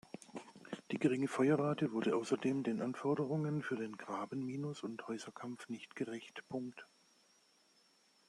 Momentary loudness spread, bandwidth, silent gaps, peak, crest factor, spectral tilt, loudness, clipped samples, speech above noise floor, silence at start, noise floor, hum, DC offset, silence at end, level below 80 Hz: 15 LU; 12 kHz; none; -20 dBFS; 20 dB; -6.5 dB/octave; -39 LUFS; under 0.1%; 33 dB; 0.3 s; -71 dBFS; none; under 0.1%; 1.45 s; -82 dBFS